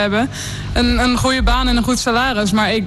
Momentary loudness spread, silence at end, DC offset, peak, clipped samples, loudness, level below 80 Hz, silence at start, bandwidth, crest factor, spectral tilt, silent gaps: 6 LU; 0 s; under 0.1%; -6 dBFS; under 0.1%; -16 LUFS; -24 dBFS; 0 s; 12.5 kHz; 10 dB; -4.5 dB/octave; none